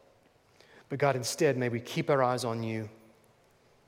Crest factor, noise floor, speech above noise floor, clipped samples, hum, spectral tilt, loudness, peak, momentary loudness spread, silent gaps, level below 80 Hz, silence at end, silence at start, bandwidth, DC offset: 20 dB; -64 dBFS; 35 dB; under 0.1%; none; -5 dB/octave; -30 LUFS; -12 dBFS; 11 LU; none; -76 dBFS; 0.95 s; 0.9 s; 16.5 kHz; under 0.1%